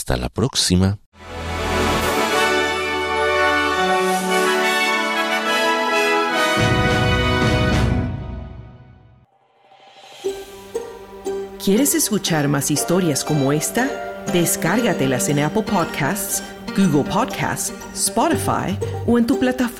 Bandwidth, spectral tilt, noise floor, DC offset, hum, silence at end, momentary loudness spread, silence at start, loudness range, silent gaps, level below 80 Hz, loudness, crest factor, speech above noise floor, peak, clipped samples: 17 kHz; -4 dB/octave; -55 dBFS; under 0.1%; none; 0 s; 12 LU; 0 s; 6 LU; 1.06-1.12 s; -36 dBFS; -19 LUFS; 16 dB; 37 dB; -4 dBFS; under 0.1%